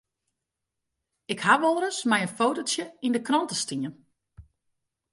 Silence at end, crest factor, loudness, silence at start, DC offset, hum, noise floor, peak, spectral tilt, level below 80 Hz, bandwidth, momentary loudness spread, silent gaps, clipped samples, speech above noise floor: 0.7 s; 22 dB; -25 LUFS; 1.3 s; under 0.1%; none; -84 dBFS; -6 dBFS; -3 dB/octave; -66 dBFS; 11.5 kHz; 10 LU; none; under 0.1%; 59 dB